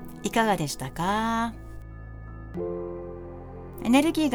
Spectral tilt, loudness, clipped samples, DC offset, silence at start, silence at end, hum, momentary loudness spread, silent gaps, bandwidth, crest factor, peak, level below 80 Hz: -5 dB/octave; -27 LUFS; under 0.1%; under 0.1%; 0 s; 0 s; none; 21 LU; none; over 20 kHz; 22 dB; -6 dBFS; -44 dBFS